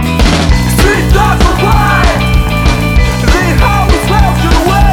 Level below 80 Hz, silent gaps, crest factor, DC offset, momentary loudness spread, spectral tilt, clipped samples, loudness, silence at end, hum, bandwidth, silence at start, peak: -12 dBFS; none; 8 dB; under 0.1%; 2 LU; -5.5 dB/octave; 0.4%; -9 LUFS; 0 s; none; 17.5 kHz; 0 s; 0 dBFS